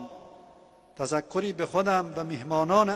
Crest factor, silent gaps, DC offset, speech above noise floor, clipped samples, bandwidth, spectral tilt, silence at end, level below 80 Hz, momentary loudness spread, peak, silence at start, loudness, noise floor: 20 dB; none; under 0.1%; 29 dB; under 0.1%; 12 kHz; -5.5 dB/octave; 0 s; -64 dBFS; 12 LU; -8 dBFS; 0 s; -28 LUFS; -55 dBFS